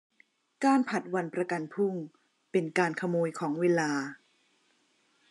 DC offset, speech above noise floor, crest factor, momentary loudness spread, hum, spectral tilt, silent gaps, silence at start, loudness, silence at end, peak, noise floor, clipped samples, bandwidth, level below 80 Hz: under 0.1%; 41 dB; 20 dB; 7 LU; none; -6 dB/octave; none; 0.6 s; -30 LUFS; 1.15 s; -12 dBFS; -70 dBFS; under 0.1%; 11.5 kHz; -86 dBFS